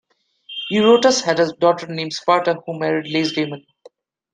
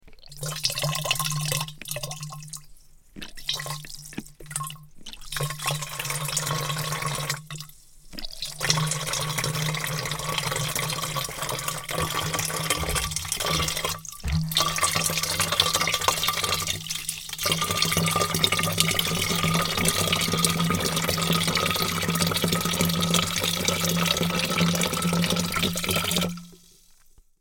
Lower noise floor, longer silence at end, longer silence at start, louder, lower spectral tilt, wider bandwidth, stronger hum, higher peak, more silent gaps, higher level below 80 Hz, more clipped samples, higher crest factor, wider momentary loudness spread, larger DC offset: second, -50 dBFS vs -55 dBFS; about the same, 0.75 s vs 0.85 s; first, 0.5 s vs 0.05 s; first, -18 LUFS vs -25 LUFS; about the same, -4 dB/octave vs -3 dB/octave; second, 9.4 kHz vs 17 kHz; neither; about the same, -2 dBFS vs 0 dBFS; neither; second, -66 dBFS vs -44 dBFS; neither; second, 18 dB vs 26 dB; about the same, 13 LU vs 12 LU; neither